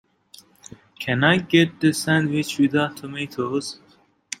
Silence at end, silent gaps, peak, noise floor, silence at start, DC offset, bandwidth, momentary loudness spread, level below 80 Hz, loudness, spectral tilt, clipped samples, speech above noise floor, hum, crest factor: 0.65 s; none; -2 dBFS; -51 dBFS; 1 s; under 0.1%; 16 kHz; 15 LU; -60 dBFS; -21 LUFS; -5 dB/octave; under 0.1%; 30 dB; none; 22 dB